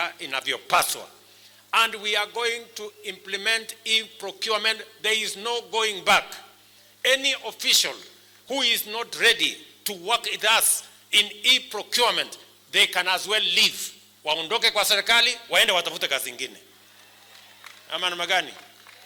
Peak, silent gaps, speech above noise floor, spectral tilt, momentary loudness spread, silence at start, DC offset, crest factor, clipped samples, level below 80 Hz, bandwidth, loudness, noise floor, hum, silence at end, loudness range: -8 dBFS; none; 30 dB; 0.5 dB/octave; 14 LU; 0 s; under 0.1%; 18 dB; under 0.1%; -68 dBFS; over 20 kHz; -22 LUFS; -54 dBFS; none; 0.45 s; 5 LU